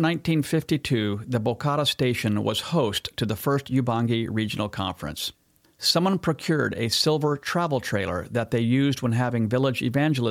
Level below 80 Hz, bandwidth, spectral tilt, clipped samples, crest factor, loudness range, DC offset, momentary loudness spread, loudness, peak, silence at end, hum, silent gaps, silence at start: -54 dBFS; 16.5 kHz; -5.5 dB/octave; under 0.1%; 18 dB; 2 LU; under 0.1%; 6 LU; -24 LUFS; -6 dBFS; 0 s; none; none; 0 s